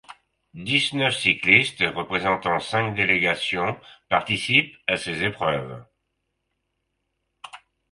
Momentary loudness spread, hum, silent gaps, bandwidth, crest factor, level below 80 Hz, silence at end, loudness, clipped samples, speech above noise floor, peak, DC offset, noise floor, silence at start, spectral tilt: 10 LU; none; none; 11.5 kHz; 24 dB; -56 dBFS; 0.35 s; -21 LUFS; under 0.1%; 54 dB; -2 dBFS; under 0.1%; -77 dBFS; 0.1 s; -4 dB/octave